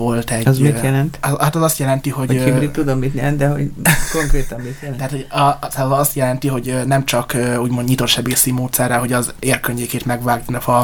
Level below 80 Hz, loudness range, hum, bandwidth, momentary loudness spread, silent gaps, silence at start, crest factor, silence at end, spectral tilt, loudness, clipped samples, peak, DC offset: -28 dBFS; 2 LU; none; over 20 kHz; 6 LU; none; 0 s; 16 dB; 0 s; -5 dB/octave; -17 LUFS; under 0.1%; 0 dBFS; under 0.1%